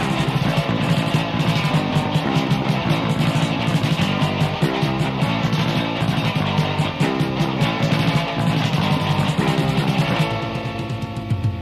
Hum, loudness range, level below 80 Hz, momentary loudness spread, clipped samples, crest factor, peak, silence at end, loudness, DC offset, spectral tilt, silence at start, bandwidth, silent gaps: none; 1 LU; -42 dBFS; 2 LU; under 0.1%; 10 dB; -10 dBFS; 0 s; -20 LUFS; under 0.1%; -6 dB/octave; 0 s; 14 kHz; none